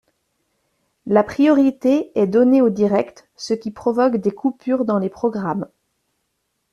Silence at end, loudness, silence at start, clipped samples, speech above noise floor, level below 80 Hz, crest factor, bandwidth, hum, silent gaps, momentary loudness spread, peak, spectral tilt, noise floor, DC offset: 1.05 s; -18 LUFS; 1.05 s; under 0.1%; 55 dB; -60 dBFS; 16 dB; 10 kHz; none; none; 11 LU; -2 dBFS; -7.5 dB/octave; -72 dBFS; under 0.1%